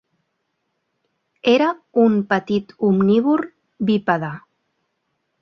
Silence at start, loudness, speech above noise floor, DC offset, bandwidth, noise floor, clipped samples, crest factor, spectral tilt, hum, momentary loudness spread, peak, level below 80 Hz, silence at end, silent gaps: 1.45 s; -19 LUFS; 56 dB; under 0.1%; 6.4 kHz; -73 dBFS; under 0.1%; 18 dB; -7.5 dB/octave; none; 9 LU; -2 dBFS; -64 dBFS; 1.05 s; none